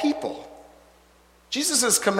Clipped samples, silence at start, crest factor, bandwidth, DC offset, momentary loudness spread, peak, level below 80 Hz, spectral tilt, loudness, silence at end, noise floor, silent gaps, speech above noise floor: under 0.1%; 0 s; 22 dB; 16.5 kHz; under 0.1%; 21 LU; -4 dBFS; -62 dBFS; -1.5 dB/octave; -23 LUFS; 0 s; -57 dBFS; none; 34 dB